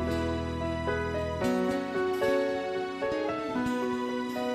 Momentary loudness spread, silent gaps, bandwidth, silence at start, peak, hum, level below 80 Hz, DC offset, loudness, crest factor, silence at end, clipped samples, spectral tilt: 5 LU; none; 13.5 kHz; 0 s; -16 dBFS; none; -50 dBFS; under 0.1%; -30 LUFS; 14 dB; 0 s; under 0.1%; -6 dB/octave